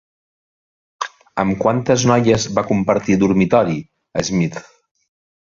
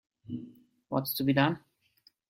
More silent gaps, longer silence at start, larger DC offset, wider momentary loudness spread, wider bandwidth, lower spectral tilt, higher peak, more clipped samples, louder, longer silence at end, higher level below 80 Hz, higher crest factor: neither; first, 1 s vs 0.3 s; neither; second, 13 LU vs 16 LU; second, 7.6 kHz vs 16.5 kHz; about the same, -5.5 dB/octave vs -6 dB/octave; first, -2 dBFS vs -10 dBFS; neither; first, -17 LUFS vs -30 LUFS; first, 0.95 s vs 0.7 s; first, -48 dBFS vs -68 dBFS; about the same, 18 dB vs 22 dB